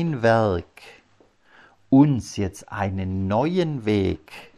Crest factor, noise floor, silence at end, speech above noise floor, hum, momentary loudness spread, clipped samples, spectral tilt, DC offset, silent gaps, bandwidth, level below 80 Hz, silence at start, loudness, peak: 18 dB; -58 dBFS; 0.15 s; 36 dB; none; 12 LU; under 0.1%; -7.5 dB/octave; under 0.1%; none; 12 kHz; -50 dBFS; 0 s; -22 LUFS; -6 dBFS